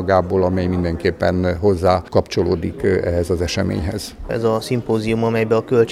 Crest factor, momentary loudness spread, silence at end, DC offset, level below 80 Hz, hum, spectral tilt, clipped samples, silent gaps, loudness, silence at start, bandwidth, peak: 16 dB; 5 LU; 0 s; under 0.1%; -36 dBFS; none; -6.5 dB/octave; under 0.1%; none; -19 LUFS; 0 s; 14.5 kHz; 0 dBFS